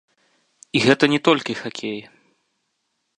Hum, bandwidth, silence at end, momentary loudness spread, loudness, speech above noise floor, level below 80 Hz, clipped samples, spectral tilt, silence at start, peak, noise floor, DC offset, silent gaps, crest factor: none; 10.5 kHz; 1.2 s; 14 LU; -20 LUFS; 54 dB; -66 dBFS; under 0.1%; -5 dB/octave; 0.75 s; 0 dBFS; -74 dBFS; under 0.1%; none; 22 dB